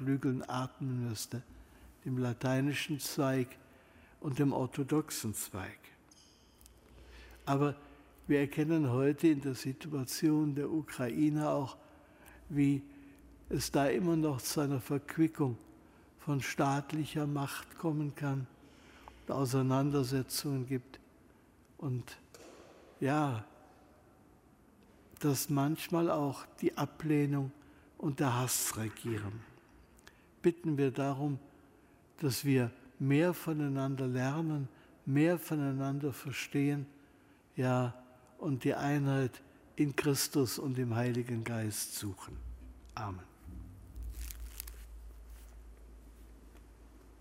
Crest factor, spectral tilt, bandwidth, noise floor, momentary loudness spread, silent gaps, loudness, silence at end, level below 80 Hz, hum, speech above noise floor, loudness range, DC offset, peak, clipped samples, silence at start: 20 dB; -6 dB/octave; 16 kHz; -63 dBFS; 18 LU; none; -34 LUFS; 0.05 s; -58 dBFS; none; 30 dB; 7 LU; under 0.1%; -16 dBFS; under 0.1%; 0 s